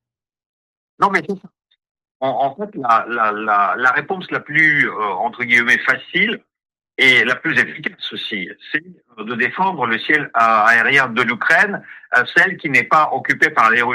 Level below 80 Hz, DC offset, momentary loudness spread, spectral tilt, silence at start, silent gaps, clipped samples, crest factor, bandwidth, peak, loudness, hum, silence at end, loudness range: -66 dBFS; under 0.1%; 12 LU; -4 dB/octave; 1 s; 1.91-1.95 s, 2.11-2.20 s; under 0.1%; 16 dB; 15.5 kHz; -2 dBFS; -15 LUFS; none; 0 s; 5 LU